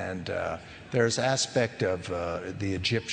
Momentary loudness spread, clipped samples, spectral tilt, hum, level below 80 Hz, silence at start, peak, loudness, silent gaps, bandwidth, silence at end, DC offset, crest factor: 8 LU; under 0.1%; -4 dB/octave; none; -56 dBFS; 0 s; -10 dBFS; -29 LUFS; none; 10 kHz; 0 s; under 0.1%; 18 dB